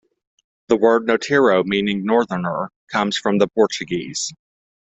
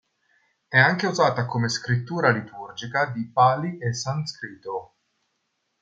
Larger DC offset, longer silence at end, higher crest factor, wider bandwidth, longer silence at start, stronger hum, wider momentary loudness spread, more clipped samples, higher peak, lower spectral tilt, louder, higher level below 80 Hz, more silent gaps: neither; second, 0.6 s vs 0.95 s; about the same, 18 dB vs 22 dB; about the same, 8.2 kHz vs 8.8 kHz; about the same, 0.7 s vs 0.7 s; neither; second, 9 LU vs 15 LU; neither; about the same, -2 dBFS vs -4 dBFS; about the same, -4.5 dB/octave vs -5 dB/octave; first, -19 LUFS vs -23 LUFS; first, -58 dBFS vs -66 dBFS; first, 2.76-2.87 s vs none